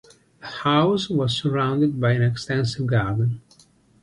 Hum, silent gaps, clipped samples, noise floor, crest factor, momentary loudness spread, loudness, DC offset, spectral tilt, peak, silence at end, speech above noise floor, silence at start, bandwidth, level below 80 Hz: none; none; under 0.1%; -56 dBFS; 16 dB; 7 LU; -22 LUFS; under 0.1%; -6.5 dB/octave; -6 dBFS; 0.65 s; 35 dB; 0.4 s; 10.5 kHz; -52 dBFS